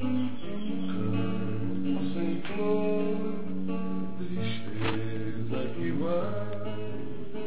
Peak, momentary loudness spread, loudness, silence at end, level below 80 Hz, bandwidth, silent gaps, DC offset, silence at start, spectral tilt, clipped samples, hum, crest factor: -14 dBFS; 7 LU; -32 LUFS; 0 s; -56 dBFS; 4 kHz; none; 4%; 0 s; -11 dB/octave; under 0.1%; none; 16 dB